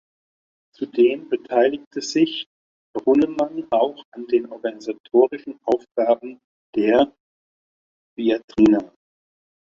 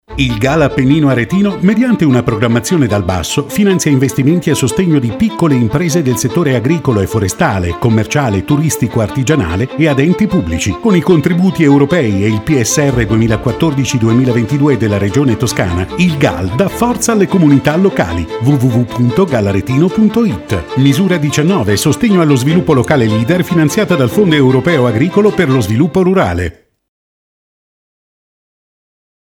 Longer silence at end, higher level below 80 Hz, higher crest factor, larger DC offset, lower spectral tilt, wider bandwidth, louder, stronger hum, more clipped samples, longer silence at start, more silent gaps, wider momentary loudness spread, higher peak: second, 0.85 s vs 2.7 s; second, -60 dBFS vs -34 dBFS; first, 18 dB vs 12 dB; neither; about the same, -5.5 dB/octave vs -6 dB/octave; second, 7.4 kHz vs 18 kHz; second, -21 LUFS vs -11 LUFS; neither; neither; first, 0.8 s vs 0.1 s; first, 1.87-1.91 s, 2.46-2.94 s, 4.05-4.12 s, 5.00-5.04 s, 5.91-5.95 s, 6.44-6.73 s, 7.20-8.16 s, 8.44-8.48 s vs none; first, 13 LU vs 4 LU; second, -4 dBFS vs 0 dBFS